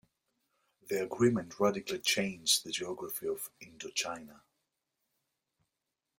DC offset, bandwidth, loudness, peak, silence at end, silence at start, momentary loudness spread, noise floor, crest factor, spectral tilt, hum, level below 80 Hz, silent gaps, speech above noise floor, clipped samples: under 0.1%; 16.5 kHz; -33 LUFS; -14 dBFS; 1.8 s; 0.85 s; 11 LU; -87 dBFS; 22 dB; -3 dB/octave; none; -74 dBFS; none; 54 dB; under 0.1%